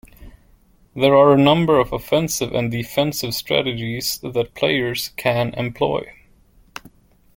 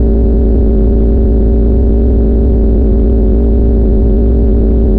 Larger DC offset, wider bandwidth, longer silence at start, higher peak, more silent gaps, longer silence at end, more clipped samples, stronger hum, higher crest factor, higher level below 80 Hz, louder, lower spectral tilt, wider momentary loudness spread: neither; first, 17 kHz vs 1.7 kHz; first, 0.2 s vs 0 s; about the same, -2 dBFS vs 0 dBFS; neither; first, 1.25 s vs 0 s; neither; neither; first, 18 dB vs 6 dB; second, -48 dBFS vs -8 dBFS; second, -19 LUFS vs -11 LUFS; second, -5 dB/octave vs -14 dB/octave; first, 16 LU vs 0 LU